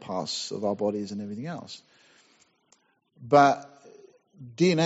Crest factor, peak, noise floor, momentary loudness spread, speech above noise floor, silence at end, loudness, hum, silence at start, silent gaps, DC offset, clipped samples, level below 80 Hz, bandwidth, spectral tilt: 22 dB; -6 dBFS; -66 dBFS; 22 LU; 41 dB; 0 s; -26 LUFS; none; 0 s; none; under 0.1%; under 0.1%; -72 dBFS; 8 kHz; -4.5 dB/octave